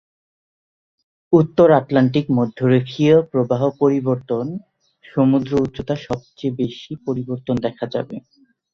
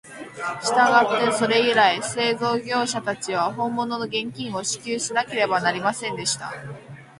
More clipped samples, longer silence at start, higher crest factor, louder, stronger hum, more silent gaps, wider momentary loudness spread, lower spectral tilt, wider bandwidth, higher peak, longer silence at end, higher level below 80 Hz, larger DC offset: neither; first, 1.3 s vs 0.05 s; about the same, 18 dB vs 20 dB; first, -19 LUFS vs -22 LUFS; neither; neither; about the same, 13 LU vs 12 LU; first, -8.5 dB/octave vs -3 dB/octave; second, 7 kHz vs 11.5 kHz; about the same, -2 dBFS vs -2 dBFS; first, 0.55 s vs 0.15 s; first, -52 dBFS vs -64 dBFS; neither